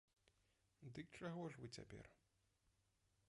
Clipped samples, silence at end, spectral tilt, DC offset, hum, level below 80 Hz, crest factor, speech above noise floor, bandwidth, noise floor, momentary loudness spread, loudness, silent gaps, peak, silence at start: under 0.1%; 1.15 s; -5.5 dB/octave; under 0.1%; none; -78 dBFS; 20 dB; 29 dB; 11 kHz; -84 dBFS; 13 LU; -55 LUFS; none; -38 dBFS; 0.8 s